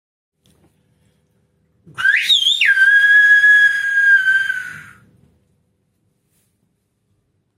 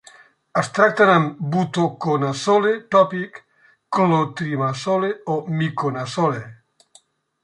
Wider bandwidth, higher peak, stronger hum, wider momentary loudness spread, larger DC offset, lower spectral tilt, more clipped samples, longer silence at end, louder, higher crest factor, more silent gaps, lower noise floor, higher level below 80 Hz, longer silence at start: first, 14.5 kHz vs 11 kHz; about the same, -4 dBFS vs -2 dBFS; neither; about the same, 10 LU vs 10 LU; neither; second, 2.5 dB/octave vs -6 dB/octave; neither; first, 2.75 s vs 0.9 s; first, -11 LUFS vs -20 LUFS; about the same, 14 dB vs 18 dB; neither; first, -66 dBFS vs -56 dBFS; about the same, -70 dBFS vs -66 dBFS; first, 2 s vs 0.55 s